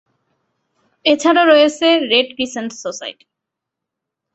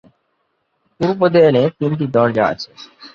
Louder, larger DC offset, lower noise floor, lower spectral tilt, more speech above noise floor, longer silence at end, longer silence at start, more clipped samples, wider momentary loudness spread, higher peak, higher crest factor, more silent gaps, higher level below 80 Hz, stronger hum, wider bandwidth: about the same, -14 LUFS vs -15 LUFS; neither; first, -81 dBFS vs -68 dBFS; second, -2 dB/octave vs -8 dB/octave; first, 67 dB vs 52 dB; first, 1.2 s vs 0.05 s; about the same, 1.05 s vs 1 s; neither; about the same, 15 LU vs 16 LU; about the same, 0 dBFS vs -2 dBFS; about the same, 16 dB vs 16 dB; neither; second, -64 dBFS vs -56 dBFS; neither; first, 8.2 kHz vs 7 kHz